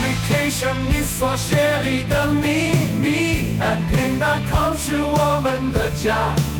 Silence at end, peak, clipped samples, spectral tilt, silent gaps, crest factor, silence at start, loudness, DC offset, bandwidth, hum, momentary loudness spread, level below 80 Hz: 0 s; -6 dBFS; under 0.1%; -5 dB/octave; none; 12 dB; 0 s; -19 LUFS; under 0.1%; 19.5 kHz; none; 3 LU; -32 dBFS